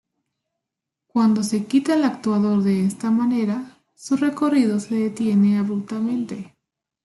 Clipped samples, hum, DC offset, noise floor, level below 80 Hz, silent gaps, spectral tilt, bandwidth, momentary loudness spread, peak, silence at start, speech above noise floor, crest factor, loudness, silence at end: under 0.1%; none; under 0.1%; -84 dBFS; -66 dBFS; none; -6.5 dB/octave; 12 kHz; 8 LU; -8 dBFS; 1.15 s; 64 dB; 14 dB; -21 LUFS; 0.6 s